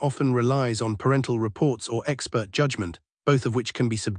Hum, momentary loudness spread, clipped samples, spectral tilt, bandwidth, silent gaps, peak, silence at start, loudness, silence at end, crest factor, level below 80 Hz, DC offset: none; 5 LU; under 0.1%; -6 dB/octave; 10.5 kHz; none; -8 dBFS; 0 s; -25 LUFS; 0 s; 16 dB; -60 dBFS; under 0.1%